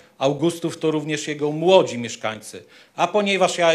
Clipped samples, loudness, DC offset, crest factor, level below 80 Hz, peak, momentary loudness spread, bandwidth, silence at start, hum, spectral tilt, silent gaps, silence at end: under 0.1%; -21 LUFS; under 0.1%; 20 dB; -70 dBFS; 0 dBFS; 17 LU; 14 kHz; 0.2 s; none; -4.5 dB/octave; none; 0 s